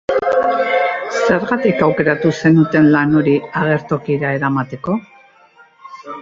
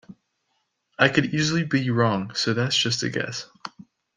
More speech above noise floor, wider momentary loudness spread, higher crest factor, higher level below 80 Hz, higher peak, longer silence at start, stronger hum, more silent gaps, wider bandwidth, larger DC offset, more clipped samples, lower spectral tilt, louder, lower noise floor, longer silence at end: second, 33 dB vs 51 dB; second, 9 LU vs 14 LU; second, 14 dB vs 22 dB; first, -54 dBFS vs -62 dBFS; about the same, -2 dBFS vs -2 dBFS; about the same, 0.1 s vs 0.1 s; neither; neither; second, 7.6 kHz vs 10 kHz; neither; neither; first, -7.5 dB/octave vs -4.5 dB/octave; first, -15 LUFS vs -23 LUFS; second, -48 dBFS vs -74 dBFS; second, 0 s vs 0.5 s